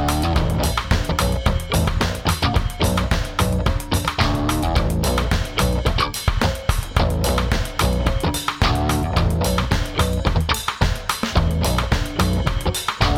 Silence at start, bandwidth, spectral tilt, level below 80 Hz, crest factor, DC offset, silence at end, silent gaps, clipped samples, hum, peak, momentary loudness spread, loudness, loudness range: 0 s; 19 kHz; -5 dB/octave; -24 dBFS; 16 dB; under 0.1%; 0 s; none; under 0.1%; none; -2 dBFS; 2 LU; -21 LUFS; 0 LU